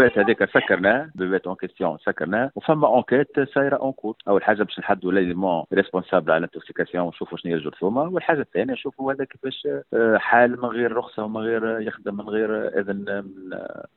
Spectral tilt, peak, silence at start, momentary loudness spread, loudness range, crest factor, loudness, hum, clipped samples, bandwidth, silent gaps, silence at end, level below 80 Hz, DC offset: -10 dB/octave; -2 dBFS; 0 s; 11 LU; 4 LU; 20 dB; -23 LUFS; none; under 0.1%; 4.3 kHz; none; 0.15 s; -62 dBFS; under 0.1%